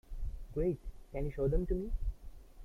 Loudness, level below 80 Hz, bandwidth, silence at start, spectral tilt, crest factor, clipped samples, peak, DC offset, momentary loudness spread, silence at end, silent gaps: -38 LUFS; -40 dBFS; 4 kHz; 0.1 s; -10 dB/octave; 16 dB; under 0.1%; -20 dBFS; under 0.1%; 13 LU; 0 s; none